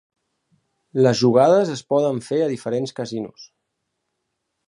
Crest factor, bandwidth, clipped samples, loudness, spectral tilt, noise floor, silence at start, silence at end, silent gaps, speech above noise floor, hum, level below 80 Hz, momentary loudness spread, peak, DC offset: 18 dB; 11 kHz; under 0.1%; -19 LUFS; -6 dB/octave; -77 dBFS; 0.95 s; 1.25 s; none; 58 dB; none; -66 dBFS; 14 LU; -2 dBFS; under 0.1%